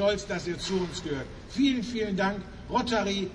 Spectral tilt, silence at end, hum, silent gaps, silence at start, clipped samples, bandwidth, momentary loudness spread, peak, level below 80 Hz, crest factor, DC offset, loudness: -5 dB/octave; 0 s; none; none; 0 s; under 0.1%; 10.5 kHz; 9 LU; -14 dBFS; -48 dBFS; 14 dB; under 0.1%; -29 LUFS